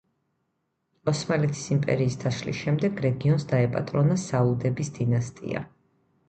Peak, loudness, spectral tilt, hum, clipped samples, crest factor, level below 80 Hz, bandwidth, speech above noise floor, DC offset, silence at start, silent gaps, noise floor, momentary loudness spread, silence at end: -10 dBFS; -26 LUFS; -6.5 dB/octave; none; under 0.1%; 16 dB; -56 dBFS; 8.8 kHz; 52 dB; under 0.1%; 1.05 s; none; -77 dBFS; 8 LU; 0.6 s